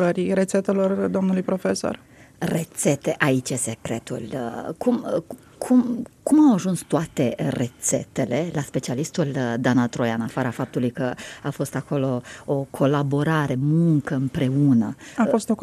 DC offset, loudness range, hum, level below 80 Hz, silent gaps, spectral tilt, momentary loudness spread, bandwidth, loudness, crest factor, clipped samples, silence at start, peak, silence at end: under 0.1%; 3 LU; none; -58 dBFS; none; -6 dB/octave; 10 LU; 14.5 kHz; -23 LUFS; 20 dB; under 0.1%; 0 s; -2 dBFS; 0 s